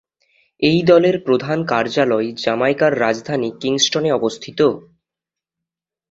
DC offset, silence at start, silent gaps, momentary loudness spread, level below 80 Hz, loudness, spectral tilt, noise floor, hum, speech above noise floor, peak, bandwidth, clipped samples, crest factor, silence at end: under 0.1%; 0.6 s; none; 8 LU; -58 dBFS; -17 LUFS; -4.5 dB/octave; -86 dBFS; none; 70 dB; -2 dBFS; 8 kHz; under 0.1%; 16 dB; 1.3 s